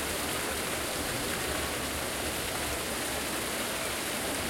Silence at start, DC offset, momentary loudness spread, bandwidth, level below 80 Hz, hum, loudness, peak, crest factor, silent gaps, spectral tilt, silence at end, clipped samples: 0 s; under 0.1%; 1 LU; 16.5 kHz; -48 dBFS; none; -31 LUFS; -18 dBFS; 14 dB; none; -2 dB/octave; 0 s; under 0.1%